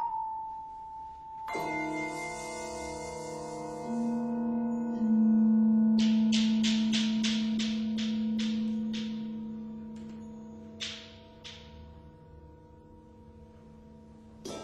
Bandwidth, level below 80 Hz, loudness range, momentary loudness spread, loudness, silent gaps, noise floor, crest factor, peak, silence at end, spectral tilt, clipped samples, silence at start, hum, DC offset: 10.5 kHz; -60 dBFS; 19 LU; 21 LU; -30 LUFS; none; -53 dBFS; 16 dB; -16 dBFS; 0 s; -5 dB/octave; under 0.1%; 0 s; none; under 0.1%